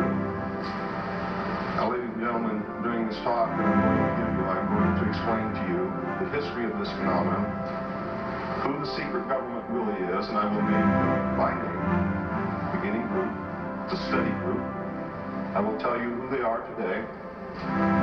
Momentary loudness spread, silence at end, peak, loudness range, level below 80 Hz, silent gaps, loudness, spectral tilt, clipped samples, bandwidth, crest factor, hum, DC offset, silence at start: 8 LU; 0 s; -10 dBFS; 4 LU; -50 dBFS; none; -28 LUFS; -8.5 dB/octave; under 0.1%; 6.2 kHz; 18 dB; none; under 0.1%; 0 s